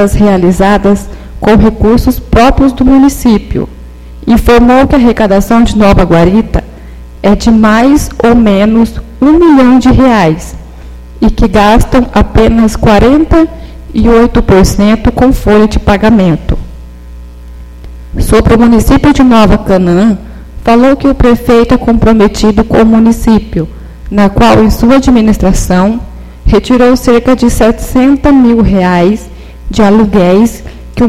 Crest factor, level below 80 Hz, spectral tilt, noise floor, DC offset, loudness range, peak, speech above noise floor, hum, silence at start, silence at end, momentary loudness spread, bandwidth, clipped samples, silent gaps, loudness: 6 dB; -16 dBFS; -6.5 dB/octave; -26 dBFS; 3%; 2 LU; 0 dBFS; 21 dB; none; 0 s; 0 s; 10 LU; 15 kHz; 3%; none; -6 LUFS